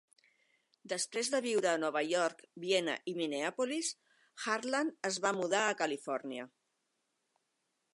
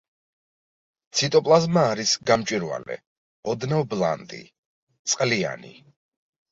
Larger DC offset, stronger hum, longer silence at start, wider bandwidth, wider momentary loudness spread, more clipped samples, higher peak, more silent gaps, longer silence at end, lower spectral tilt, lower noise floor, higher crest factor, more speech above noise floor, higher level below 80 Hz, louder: neither; neither; second, 0.85 s vs 1.15 s; first, 11.5 kHz vs 8 kHz; second, 9 LU vs 18 LU; neither; second, -16 dBFS vs -4 dBFS; second, none vs 3.07-3.43 s, 4.58-4.87 s, 4.99-5.05 s; first, 1.45 s vs 0.8 s; second, -2.5 dB/octave vs -4 dB/octave; second, -82 dBFS vs under -90 dBFS; about the same, 20 dB vs 22 dB; second, 48 dB vs over 67 dB; second, under -90 dBFS vs -62 dBFS; second, -35 LUFS vs -23 LUFS